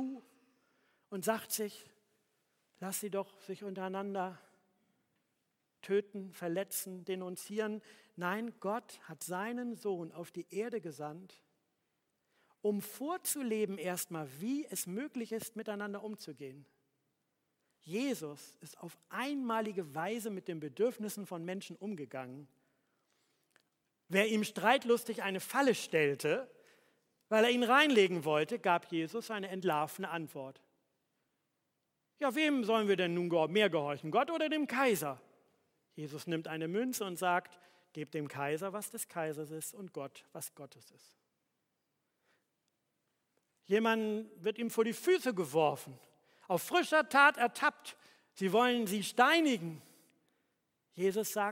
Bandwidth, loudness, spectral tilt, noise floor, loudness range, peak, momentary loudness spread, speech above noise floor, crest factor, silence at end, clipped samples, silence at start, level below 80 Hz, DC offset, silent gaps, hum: 16.5 kHz; -34 LUFS; -4 dB/octave; -83 dBFS; 12 LU; -12 dBFS; 17 LU; 49 dB; 24 dB; 0 s; under 0.1%; 0 s; under -90 dBFS; under 0.1%; none; none